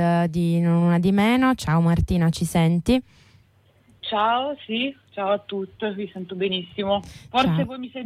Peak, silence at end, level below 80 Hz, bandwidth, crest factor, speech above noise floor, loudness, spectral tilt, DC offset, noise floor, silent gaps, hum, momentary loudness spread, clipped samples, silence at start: -8 dBFS; 0 s; -42 dBFS; 13.5 kHz; 14 dB; 36 dB; -22 LUFS; -6.5 dB/octave; under 0.1%; -58 dBFS; none; none; 10 LU; under 0.1%; 0 s